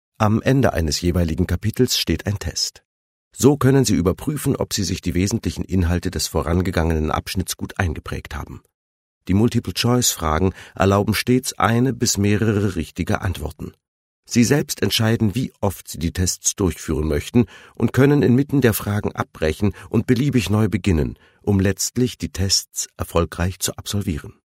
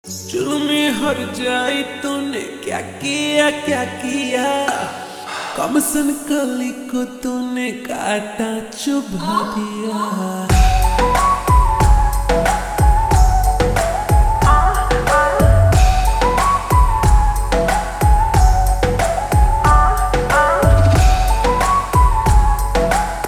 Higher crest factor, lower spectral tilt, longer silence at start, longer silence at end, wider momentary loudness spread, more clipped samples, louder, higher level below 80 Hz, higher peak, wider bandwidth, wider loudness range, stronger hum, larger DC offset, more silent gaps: first, 20 dB vs 14 dB; about the same, -5 dB/octave vs -5 dB/octave; first, 0.2 s vs 0.05 s; first, 0.15 s vs 0 s; about the same, 8 LU vs 10 LU; neither; second, -20 LUFS vs -16 LUFS; second, -36 dBFS vs -18 dBFS; about the same, 0 dBFS vs -2 dBFS; first, 16 kHz vs 14 kHz; second, 3 LU vs 6 LU; neither; neither; first, 2.85-3.31 s, 8.74-9.21 s, 13.88-14.23 s vs none